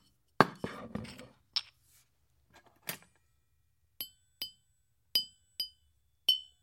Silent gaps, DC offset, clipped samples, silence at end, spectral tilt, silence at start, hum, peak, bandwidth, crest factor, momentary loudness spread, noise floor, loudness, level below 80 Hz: none; under 0.1%; under 0.1%; 0.2 s; -3 dB/octave; 0.4 s; none; -2 dBFS; 16.5 kHz; 36 dB; 15 LU; -76 dBFS; -35 LUFS; -70 dBFS